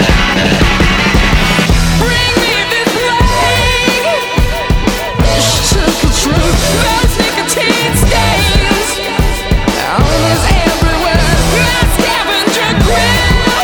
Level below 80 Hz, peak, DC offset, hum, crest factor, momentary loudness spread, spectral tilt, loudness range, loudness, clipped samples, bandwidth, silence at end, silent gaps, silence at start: -16 dBFS; 0 dBFS; under 0.1%; none; 10 dB; 4 LU; -4 dB/octave; 1 LU; -10 LUFS; 0.2%; over 20 kHz; 0 s; none; 0 s